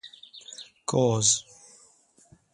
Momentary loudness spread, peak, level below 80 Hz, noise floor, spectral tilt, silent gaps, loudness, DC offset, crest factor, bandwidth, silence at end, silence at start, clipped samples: 23 LU; -8 dBFS; -64 dBFS; -60 dBFS; -3.5 dB/octave; none; -24 LUFS; under 0.1%; 22 dB; 11.5 kHz; 1.15 s; 0.05 s; under 0.1%